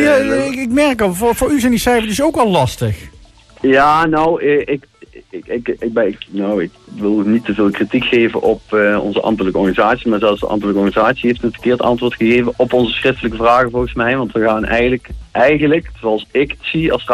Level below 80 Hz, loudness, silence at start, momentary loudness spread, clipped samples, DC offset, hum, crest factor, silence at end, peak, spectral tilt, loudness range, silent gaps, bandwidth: -36 dBFS; -15 LUFS; 0 s; 8 LU; under 0.1%; under 0.1%; none; 12 dB; 0 s; -2 dBFS; -5.5 dB/octave; 2 LU; none; 14.5 kHz